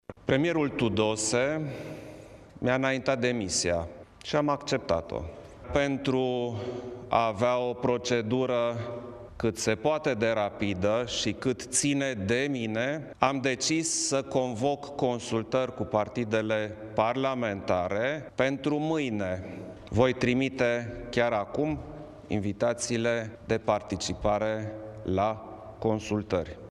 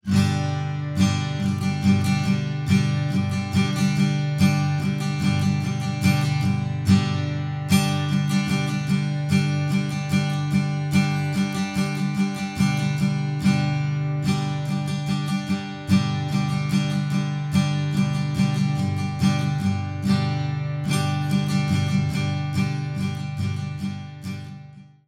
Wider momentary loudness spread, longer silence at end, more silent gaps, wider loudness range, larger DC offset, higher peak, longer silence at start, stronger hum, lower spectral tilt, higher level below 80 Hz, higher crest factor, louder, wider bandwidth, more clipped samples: first, 10 LU vs 6 LU; second, 0 s vs 0.25 s; neither; about the same, 2 LU vs 2 LU; neither; about the same, -4 dBFS vs -6 dBFS; about the same, 0.1 s vs 0.05 s; second, none vs 50 Hz at -50 dBFS; second, -4.5 dB/octave vs -6 dB/octave; about the same, -52 dBFS vs -52 dBFS; first, 24 dB vs 16 dB; second, -29 LUFS vs -23 LUFS; second, 13 kHz vs 14.5 kHz; neither